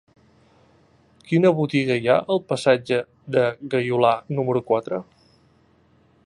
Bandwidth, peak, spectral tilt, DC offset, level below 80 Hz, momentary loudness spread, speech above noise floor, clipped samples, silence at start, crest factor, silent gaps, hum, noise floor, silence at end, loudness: 11 kHz; -4 dBFS; -6.5 dB/octave; under 0.1%; -64 dBFS; 6 LU; 38 dB; under 0.1%; 1.3 s; 18 dB; none; none; -58 dBFS; 1.25 s; -21 LUFS